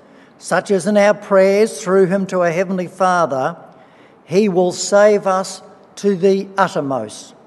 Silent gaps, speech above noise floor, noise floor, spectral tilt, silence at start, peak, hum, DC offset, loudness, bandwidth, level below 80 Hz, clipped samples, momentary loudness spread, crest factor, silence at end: none; 30 dB; -46 dBFS; -5 dB/octave; 0.45 s; 0 dBFS; none; under 0.1%; -16 LUFS; 12 kHz; -70 dBFS; under 0.1%; 11 LU; 16 dB; 0.2 s